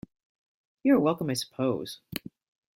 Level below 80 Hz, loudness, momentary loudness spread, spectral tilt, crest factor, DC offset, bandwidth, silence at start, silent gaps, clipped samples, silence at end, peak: -66 dBFS; -28 LUFS; 15 LU; -5.5 dB/octave; 20 dB; under 0.1%; 16.5 kHz; 0.85 s; none; under 0.1%; 0.6 s; -10 dBFS